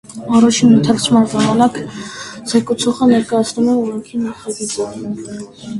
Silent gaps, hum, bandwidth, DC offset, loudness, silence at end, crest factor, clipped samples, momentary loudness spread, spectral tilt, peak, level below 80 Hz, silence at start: none; none; 11.5 kHz; under 0.1%; -14 LUFS; 0 s; 14 dB; under 0.1%; 16 LU; -5 dB/octave; 0 dBFS; -50 dBFS; 0.1 s